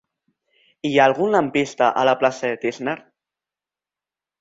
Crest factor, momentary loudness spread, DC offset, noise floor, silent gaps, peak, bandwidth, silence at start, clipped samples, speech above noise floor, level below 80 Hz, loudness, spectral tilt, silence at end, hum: 20 dB; 12 LU; under 0.1%; -90 dBFS; none; -2 dBFS; 8 kHz; 0.85 s; under 0.1%; 71 dB; -64 dBFS; -20 LUFS; -5 dB/octave; 1.45 s; 50 Hz at -55 dBFS